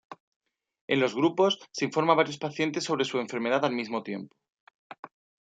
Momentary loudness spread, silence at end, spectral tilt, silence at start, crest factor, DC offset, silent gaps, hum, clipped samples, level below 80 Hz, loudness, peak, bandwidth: 16 LU; 0.4 s; -4.5 dB/octave; 0.1 s; 24 dB; under 0.1%; 0.20-0.40 s, 0.81-0.88 s, 4.52-4.67 s, 4.74-4.90 s, 4.99-5.03 s; none; under 0.1%; -78 dBFS; -27 LUFS; -6 dBFS; 9.2 kHz